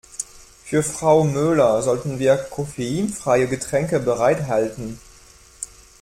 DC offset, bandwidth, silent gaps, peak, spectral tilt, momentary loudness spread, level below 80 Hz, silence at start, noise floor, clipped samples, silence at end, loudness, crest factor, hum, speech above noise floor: under 0.1%; 16 kHz; none; -4 dBFS; -5.5 dB/octave; 17 LU; -50 dBFS; 0.15 s; -48 dBFS; under 0.1%; 0.35 s; -20 LUFS; 18 dB; none; 29 dB